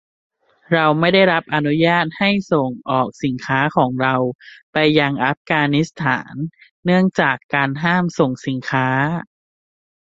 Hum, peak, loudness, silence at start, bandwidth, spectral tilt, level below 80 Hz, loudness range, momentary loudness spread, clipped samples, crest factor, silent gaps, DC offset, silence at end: none; -2 dBFS; -18 LUFS; 0.7 s; 7.8 kHz; -6.5 dB/octave; -56 dBFS; 2 LU; 9 LU; under 0.1%; 18 dB; 4.35-4.39 s, 4.63-4.73 s, 5.37-5.45 s, 6.71-6.83 s, 7.44-7.49 s; under 0.1%; 0.9 s